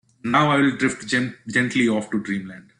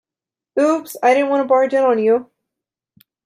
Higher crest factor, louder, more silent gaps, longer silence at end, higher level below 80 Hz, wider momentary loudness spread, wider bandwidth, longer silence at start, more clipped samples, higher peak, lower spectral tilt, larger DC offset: about the same, 16 dB vs 16 dB; second, -21 LUFS vs -16 LUFS; neither; second, 0.2 s vs 1 s; first, -60 dBFS vs -74 dBFS; first, 8 LU vs 4 LU; second, 10.5 kHz vs 15.5 kHz; second, 0.25 s vs 0.55 s; neither; second, -6 dBFS vs -2 dBFS; about the same, -5 dB/octave vs -4.5 dB/octave; neither